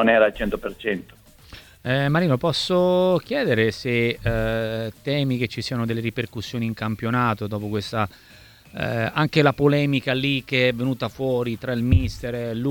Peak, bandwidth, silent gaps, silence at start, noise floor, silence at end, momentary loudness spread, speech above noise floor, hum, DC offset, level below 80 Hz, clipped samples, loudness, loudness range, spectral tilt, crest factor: -4 dBFS; 19 kHz; none; 0 s; -46 dBFS; 0 s; 9 LU; 24 dB; none; under 0.1%; -40 dBFS; under 0.1%; -23 LUFS; 4 LU; -6.5 dB/octave; 20 dB